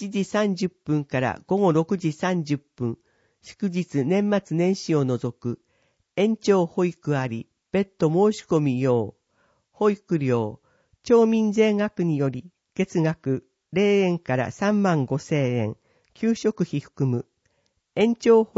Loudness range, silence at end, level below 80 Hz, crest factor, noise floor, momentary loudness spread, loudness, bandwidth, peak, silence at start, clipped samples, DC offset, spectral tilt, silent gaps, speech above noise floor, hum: 3 LU; 0.15 s; -64 dBFS; 18 dB; -70 dBFS; 11 LU; -24 LUFS; 8 kHz; -6 dBFS; 0 s; under 0.1%; under 0.1%; -7 dB/octave; none; 47 dB; none